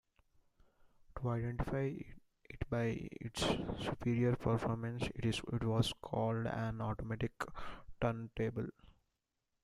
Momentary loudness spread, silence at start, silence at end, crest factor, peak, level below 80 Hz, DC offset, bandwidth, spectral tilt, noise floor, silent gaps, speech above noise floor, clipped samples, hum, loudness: 11 LU; 1.1 s; 0.7 s; 22 dB; -18 dBFS; -54 dBFS; under 0.1%; 13 kHz; -6.5 dB/octave; -87 dBFS; none; 49 dB; under 0.1%; none; -39 LUFS